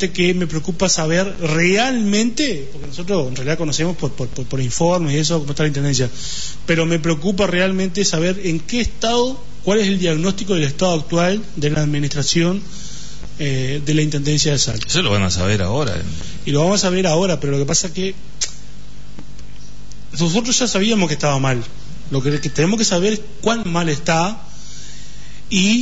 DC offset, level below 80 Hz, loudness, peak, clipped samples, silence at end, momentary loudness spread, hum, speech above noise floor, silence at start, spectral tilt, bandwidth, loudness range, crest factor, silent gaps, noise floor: 7%; -38 dBFS; -18 LUFS; -4 dBFS; under 0.1%; 0 s; 10 LU; none; 20 dB; 0 s; -4.5 dB/octave; 8 kHz; 2 LU; 14 dB; none; -38 dBFS